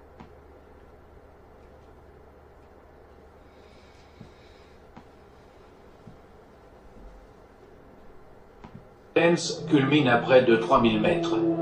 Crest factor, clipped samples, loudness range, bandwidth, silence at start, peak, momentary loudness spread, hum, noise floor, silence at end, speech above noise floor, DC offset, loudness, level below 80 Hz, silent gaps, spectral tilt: 22 dB; under 0.1%; 8 LU; 9.6 kHz; 0.2 s; -6 dBFS; 15 LU; none; -52 dBFS; 0 s; 30 dB; under 0.1%; -22 LUFS; -54 dBFS; none; -5.5 dB/octave